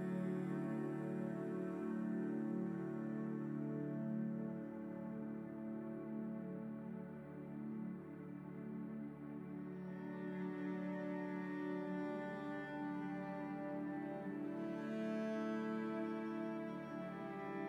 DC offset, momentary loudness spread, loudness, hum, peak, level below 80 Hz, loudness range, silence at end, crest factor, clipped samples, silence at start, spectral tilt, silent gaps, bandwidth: under 0.1%; 7 LU; -45 LUFS; none; -32 dBFS; -78 dBFS; 5 LU; 0 s; 12 dB; under 0.1%; 0 s; -9 dB/octave; none; 17.5 kHz